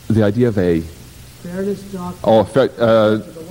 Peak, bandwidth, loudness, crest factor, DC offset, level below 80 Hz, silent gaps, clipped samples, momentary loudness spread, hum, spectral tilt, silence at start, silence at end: -2 dBFS; 16.5 kHz; -16 LUFS; 14 dB; under 0.1%; -44 dBFS; none; under 0.1%; 15 LU; none; -7.5 dB/octave; 0.05 s; 0 s